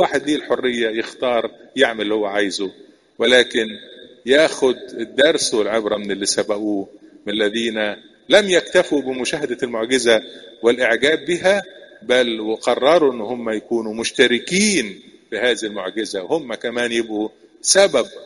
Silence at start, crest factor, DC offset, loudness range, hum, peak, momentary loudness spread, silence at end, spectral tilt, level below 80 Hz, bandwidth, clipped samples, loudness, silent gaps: 0 s; 18 dB; under 0.1%; 2 LU; none; 0 dBFS; 11 LU; 0 s; -2.5 dB/octave; -58 dBFS; 11.5 kHz; under 0.1%; -18 LUFS; none